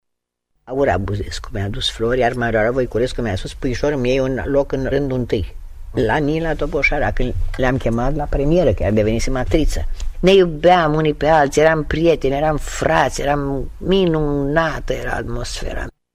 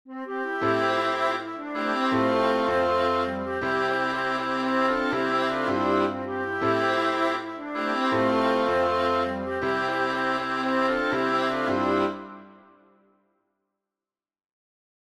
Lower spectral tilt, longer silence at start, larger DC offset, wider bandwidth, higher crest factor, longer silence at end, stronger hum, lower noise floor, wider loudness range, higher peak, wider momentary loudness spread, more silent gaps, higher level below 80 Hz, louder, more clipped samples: about the same, -6 dB/octave vs -5.5 dB/octave; first, 0.65 s vs 0.05 s; neither; first, 14.5 kHz vs 13 kHz; about the same, 14 dB vs 14 dB; second, 0.25 s vs 2.55 s; neither; second, -77 dBFS vs under -90 dBFS; about the same, 5 LU vs 3 LU; first, -2 dBFS vs -12 dBFS; first, 11 LU vs 7 LU; neither; first, -26 dBFS vs -60 dBFS; first, -18 LUFS vs -25 LUFS; neither